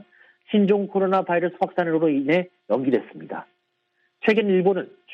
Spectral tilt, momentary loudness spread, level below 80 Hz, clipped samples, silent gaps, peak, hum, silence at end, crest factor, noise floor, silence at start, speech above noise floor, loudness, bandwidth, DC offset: -8.5 dB/octave; 9 LU; -72 dBFS; under 0.1%; none; -6 dBFS; none; 0 s; 18 dB; -72 dBFS; 0.5 s; 50 dB; -22 LUFS; 6.2 kHz; under 0.1%